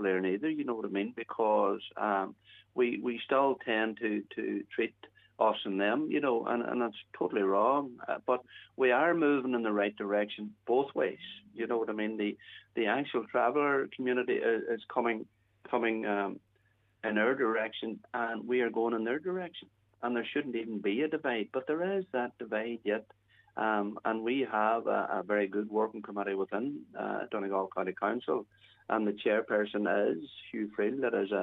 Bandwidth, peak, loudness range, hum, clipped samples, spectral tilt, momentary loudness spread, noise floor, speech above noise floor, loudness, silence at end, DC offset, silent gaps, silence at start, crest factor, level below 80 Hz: 4.1 kHz; -14 dBFS; 4 LU; none; under 0.1%; -8 dB/octave; 9 LU; -71 dBFS; 39 dB; -32 LUFS; 0 s; under 0.1%; none; 0 s; 20 dB; -82 dBFS